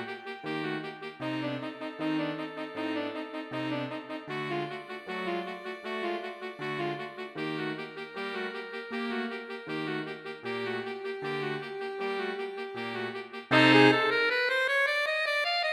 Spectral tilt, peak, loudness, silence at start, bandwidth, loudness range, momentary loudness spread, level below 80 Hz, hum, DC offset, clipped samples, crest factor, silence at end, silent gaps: -5.5 dB/octave; -8 dBFS; -31 LUFS; 0 s; 14 kHz; 10 LU; 13 LU; -78 dBFS; none; under 0.1%; under 0.1%; 24 dB; 0 s; none